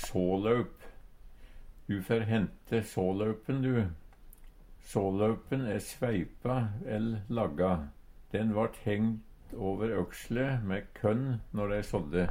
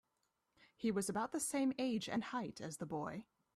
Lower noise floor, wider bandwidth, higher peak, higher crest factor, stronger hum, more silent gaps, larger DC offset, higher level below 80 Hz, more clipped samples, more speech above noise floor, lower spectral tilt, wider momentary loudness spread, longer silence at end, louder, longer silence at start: second, -52 dBFS vs -85 dBFS; first, 16.5 kHz vs 14.5 kHz; first, -14 dBFS vs -26 dBFS; about the same, 18 dB vs 14 dB; neither; neither; neither; first, -50 dBFS vs -76 dBFS; neither; second, 20 dB vs 45 dB; first, -7.5 dB/octave vs -4.5 dB/octave; about the same, 7 LU vs 9 LU; second, 0 s vs 0.35 s; first, -33 LUFS vs -41 LUFS; second, 0 s vs 0.8 s